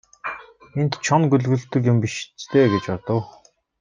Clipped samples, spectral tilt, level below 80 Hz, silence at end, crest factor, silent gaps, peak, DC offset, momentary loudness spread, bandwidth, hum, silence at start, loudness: under 0.1%; -6.5 dB/octave; -60 dBFS; 0.5 s; 18 dB; none; -4 dBFS; under 0.1%; 14 LU; 9.4 kHz; none; 0.25 s; -21 LUFS